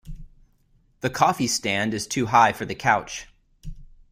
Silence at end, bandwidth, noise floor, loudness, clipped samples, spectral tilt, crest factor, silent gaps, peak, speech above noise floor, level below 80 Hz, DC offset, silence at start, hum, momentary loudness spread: 0.25 s; 16 kHz; -61 dBFS; -22 LUFS; under 0.1%; -3.5 dB/octave; 22 dB; none; -4 dBFS; 39 dB; -46 dBFS; under 0.1%; 0.05 s; none; 12 LU